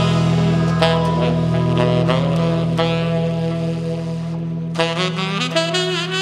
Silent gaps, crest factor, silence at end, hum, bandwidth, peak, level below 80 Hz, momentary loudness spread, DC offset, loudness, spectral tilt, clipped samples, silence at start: none; 16 dB; 0 s; none; 10 kHz; -2 dBFS; -42 dBFS; 8 LU; under 0.1%; -18 LUFS; -6 dB/octave; under 0.1%; 0 s